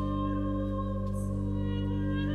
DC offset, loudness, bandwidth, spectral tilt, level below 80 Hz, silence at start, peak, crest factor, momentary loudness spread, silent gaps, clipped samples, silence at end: under 0.1%; -32 LUFS; 11 kHz; -8.5 dB/octave; -38 dBFS; 0 s; -18 dBFS; 12 dB; 2 LU; none; under 0.1%; 0 s